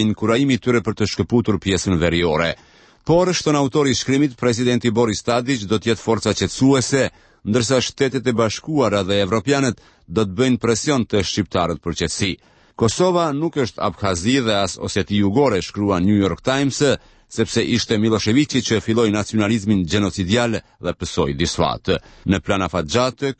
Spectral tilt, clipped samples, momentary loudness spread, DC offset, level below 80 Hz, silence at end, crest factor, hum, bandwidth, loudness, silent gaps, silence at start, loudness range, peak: -5 dB/octave; under 0.1%; 6 LU; under 0.1%; -42 dBFS; 0.05 s; 16 dB; none; 8.8 kHz; -19 LUFS; none; 0 s; 2 LU; -4 dBFS